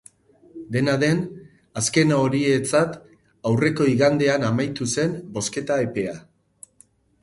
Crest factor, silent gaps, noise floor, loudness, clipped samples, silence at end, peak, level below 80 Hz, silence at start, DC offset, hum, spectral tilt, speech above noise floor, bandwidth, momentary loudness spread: 18 dB; none; -57 dBFS; -22 LUFS; under 0.1%; 1 s; -4 dBFS; -58 dBFS; 0.55 s; under 0.1%; none; -5 dB/octave; 37 dB; 11.5 kHz; 12 LU